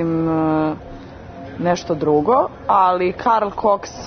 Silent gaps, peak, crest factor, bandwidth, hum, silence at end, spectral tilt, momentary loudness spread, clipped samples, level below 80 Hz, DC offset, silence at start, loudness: none; -4 dBFS; 14 dB; 6.6 kHz; none; 0 s; -6.5 dB/octave; 19 LU; under 0.1%; -46 dBFS; under 0.1%; 0 s; -18 LUFS